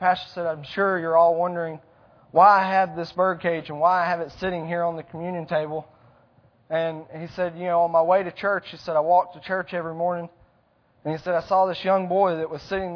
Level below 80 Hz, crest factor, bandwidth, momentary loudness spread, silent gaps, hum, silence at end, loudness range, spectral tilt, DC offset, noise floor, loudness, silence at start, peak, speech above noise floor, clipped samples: -60 dBFS; 20 dB; 5.4 kHz; 13 LU; none; none; 0 s; 6 LU; -7 dB/octave; under 0.1%; -63 dBFS; -23 LUFS; 0 s; -4 dBFS; 40 dB; under 0.1%